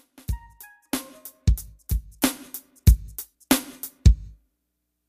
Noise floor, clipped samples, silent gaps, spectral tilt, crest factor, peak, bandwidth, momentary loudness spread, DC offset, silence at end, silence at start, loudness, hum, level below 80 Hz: -78 dBFS; under 0.1%; none; -5 dB/octave; 22 dB; -2 dBFS; 15.5 kHz; 16 LU; under 0.1%; 0.8 s; 0.3 s; -25 LUFS; none; -26 dBFS